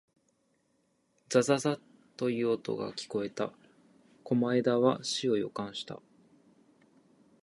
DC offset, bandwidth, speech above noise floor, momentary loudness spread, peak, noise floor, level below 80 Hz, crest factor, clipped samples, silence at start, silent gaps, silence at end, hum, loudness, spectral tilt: under 0.1%; 11.5 kHz; 44 dB; 12 LU; -10 dBFS; -74 dBFS; -76 dBFS; 22 dB; under 0.1%; 1.3 s; none; 1.5 s; none; -31 LUFS; -5 dB/octave